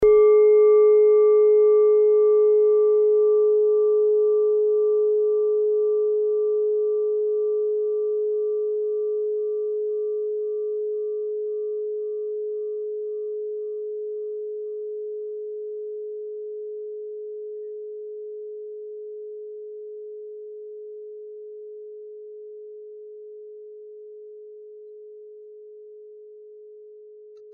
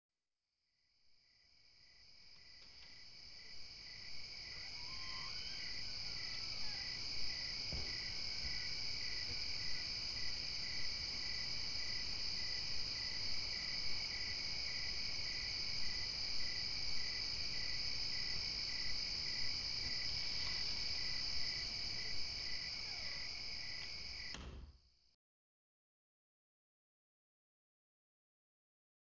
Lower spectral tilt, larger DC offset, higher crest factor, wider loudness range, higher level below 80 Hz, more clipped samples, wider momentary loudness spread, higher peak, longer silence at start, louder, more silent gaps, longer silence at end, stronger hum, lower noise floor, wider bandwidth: about the same, -2 dB/octave vs -1 dB/octave; second, under 0.1% vs 0.4%; about the same, 14 dB vs 16 dB; first, 24 LU vs 12 LU; about the same, -62 dBFS vs -60 dBFS; neither; first, 24 LU vs 10 LU; first, -10 dBFS vs -26 dBFS; about the same, 0 s vs 0.1 s; first, -21 LUFS vs -41 LUFS; neither; second, 0 s vs 4 s; neither; second, -45 dBFS vs under -90 dBFS; second, 2.3 kHz vs 8 kHz